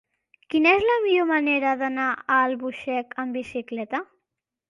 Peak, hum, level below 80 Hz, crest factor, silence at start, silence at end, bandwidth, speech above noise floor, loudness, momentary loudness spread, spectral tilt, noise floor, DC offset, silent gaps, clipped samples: -8 dBFS; none; -62 dBFS; 16 dB; 0.5 s; 0.65 s; 10.5 kHz; 61 dB; -23 LUFS; 12 LU; -5 dB/octave; -84 dBFS; under 0.1%; none; under 0.1%